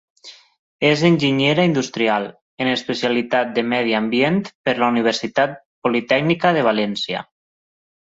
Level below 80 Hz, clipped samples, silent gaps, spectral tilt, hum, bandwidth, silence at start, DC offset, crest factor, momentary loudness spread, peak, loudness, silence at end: -60 dBFS; under 0.1%; 0.59-0.79 s, 2.42-2.57 s, 4.55-4.64 s, 5.65-5.82 s; -5.5 dB/octave; none; 8 kHz; 0.25 s; under 0.1%; 16 dB; 7 LU; -2 dBFS; -19 LUFS; 0.8 s